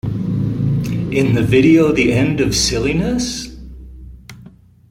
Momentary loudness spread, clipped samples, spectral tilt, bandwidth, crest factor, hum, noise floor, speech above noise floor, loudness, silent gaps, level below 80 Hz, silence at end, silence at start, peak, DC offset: 13 LU; under 0.1%; -5.5 dB/octave; 16 kHz; 14 dB; none; -43 dBFS; 29 dB; -15 LUFS; none; -34 dBFS; 0.4 s; 0.05 s; -2 dBFS; under 0.1%